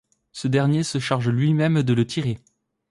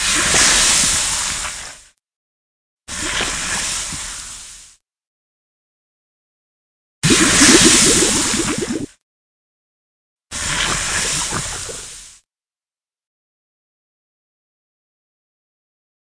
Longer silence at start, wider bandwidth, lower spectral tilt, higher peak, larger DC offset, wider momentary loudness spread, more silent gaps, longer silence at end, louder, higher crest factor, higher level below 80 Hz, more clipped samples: first, 0.35 s vs 0 s; about the same, 11.5 kHz vs 11 kHz; first, -6.5 dB/octave vs -1.5 dB/octave; second, -8 dBFS vs 0 dBFS; neither; second, 10 LU vs 21 LU; second, none vs 2.16-2.77 s, 5.07-7.02 s, 9.02-10.17 s; second, 0.55 s vs 4 s; second, -22 LUFS vs -14 LUFS; second, 14 dB vs 20 dB; second, -56 dBFS vs -38 dBFS; neither